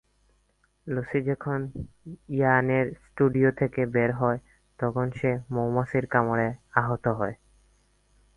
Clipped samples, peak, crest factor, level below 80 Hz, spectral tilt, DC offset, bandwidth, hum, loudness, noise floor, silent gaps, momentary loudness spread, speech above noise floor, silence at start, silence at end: under 0.1%; -4 dBFS; 22 dB; -54 dBFS; -9.5 dB/octave; under 0.1%; 10.5 kHz; none; -26 LUFS; -68 dBFS; none; 11 LU; 42 dB; 0.85 s; 1 s